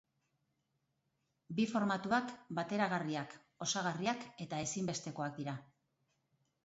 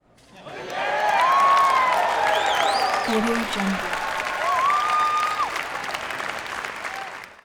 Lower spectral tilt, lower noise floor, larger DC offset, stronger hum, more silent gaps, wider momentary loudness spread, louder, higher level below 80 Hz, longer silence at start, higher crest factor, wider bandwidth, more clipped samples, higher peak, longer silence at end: about the same, -4 dB/octave vs -3 dB/octave; first, -83 dBFS vs -45 dBFS; neither; neither; neither; second, 9 LU vs 13 LU; second, -38 LUFS vs -22 LUFS; second, -76 dBFS vs -54 dBFS; first, 1.5 s vs 0.35 s; first, 22 dB vs 16 dB; second, 8 kHz vs over 20 kHz; neither; second, -18 dBFS vs -6 dBFS; first, 1 s vs 0.1 s